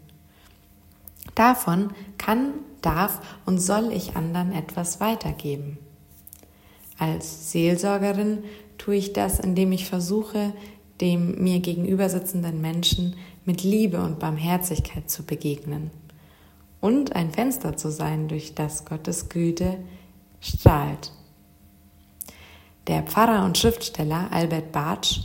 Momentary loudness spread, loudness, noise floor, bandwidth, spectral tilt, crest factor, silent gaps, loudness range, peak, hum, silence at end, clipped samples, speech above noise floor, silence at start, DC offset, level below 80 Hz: 13 LU; -24 LUFS; -54 dBFS; 16.5 kHz; -5 dB/octave; 24 dB; none; 4 LU; 0 dBFS; none; 0 s; under 0.1%; 30 dB; 1.25 s; under 0.1%; -42 dBFS